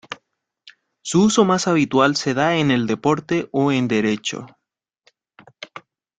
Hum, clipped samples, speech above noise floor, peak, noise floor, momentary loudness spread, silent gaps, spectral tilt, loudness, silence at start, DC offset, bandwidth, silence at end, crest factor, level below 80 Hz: none; under 0.1%; 50 dB; -2 dBFS; -68 dBFS; 20 LU; none; -5 dB/octave; -19 LUFS; 0.1 s; under 0.1%; 9.4 kHz; 0.4 s; 18 dB; -58 dBFS